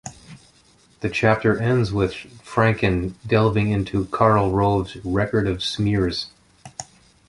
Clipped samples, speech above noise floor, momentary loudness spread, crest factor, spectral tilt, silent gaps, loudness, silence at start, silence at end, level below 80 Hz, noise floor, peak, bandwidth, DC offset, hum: under 0.1%; 35 dB; 18 LU; 20 dB; -6.5 dB/octave; none; -21 LUFS; 0.05 s; 0.45 s; -40 dBFS; -56 dBFS; -2 dBFS; 11.5 kHz; under 0.1%; none